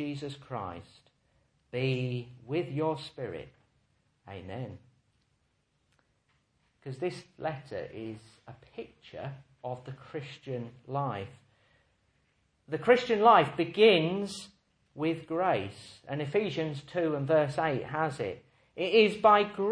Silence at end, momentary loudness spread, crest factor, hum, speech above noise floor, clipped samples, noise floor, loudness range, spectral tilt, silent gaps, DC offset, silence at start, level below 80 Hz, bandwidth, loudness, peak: 0 s; 22 LU; 22 dB; none; 45 dB; under 0.1%; -74 dBFS; 16 LU; -6 dB/octave; none; under 0.1%; 0 s; -70 dBFS; 10.5 kHz; -29 LUFS; -8 dBFS